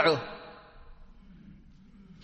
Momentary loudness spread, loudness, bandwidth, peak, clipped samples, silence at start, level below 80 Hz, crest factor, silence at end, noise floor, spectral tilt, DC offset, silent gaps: 25 LU; -31 LUFS; 8.2 kHz; -8 dBFS; under 0.1%; 0 s; -56 dBFS; 26 dB; 0.7 s; -54 dBFS; -5.5 dB/octave; under 0.1%; none